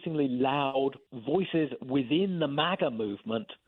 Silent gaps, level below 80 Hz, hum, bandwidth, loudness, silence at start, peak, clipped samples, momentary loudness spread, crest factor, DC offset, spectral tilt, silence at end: none; -70 dBFS; none; 4.2 kHz; -29 LUFS; 0 s; -12 dBFS; under 0.1%; 7 LU; 18 dB; under 0.1%; -9 dB/octave; 0.15 s